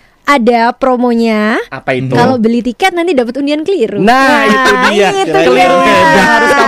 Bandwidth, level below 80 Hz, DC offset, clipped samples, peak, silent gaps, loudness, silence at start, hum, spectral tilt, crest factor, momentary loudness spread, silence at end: 15.5 kHz; -40 dBFS; under 0.1%; under 0.1%; 0 dBFS; none; -9 LUFS; 0.25 s; none; -4.5 dB/octave; 8 dB; 7 LU; 0 s